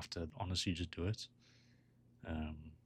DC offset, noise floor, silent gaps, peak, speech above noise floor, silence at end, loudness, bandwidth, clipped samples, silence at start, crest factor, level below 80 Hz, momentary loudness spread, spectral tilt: under 0.1%; -69 dBFS; none; -26 dBFS; 26 dB; 0.1 s; -43 LUFS; 13 kHz; under 0.1%; 0 s; 18 dB; -56 dBFS; 11 LU; -5 dB/octave